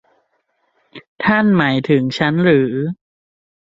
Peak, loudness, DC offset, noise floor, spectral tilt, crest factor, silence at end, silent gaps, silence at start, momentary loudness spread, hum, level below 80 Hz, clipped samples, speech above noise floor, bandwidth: 0 dBFS; -15 LUFS; under 0.1%; -66 dBFS; -7.5 dB/octave; 18 dB; 0.7 s; 1.08-1.16 s; 0.95 s; 10 LU; none; -54 dBFS; under 0.1%; 51 dB; 7.8 kHz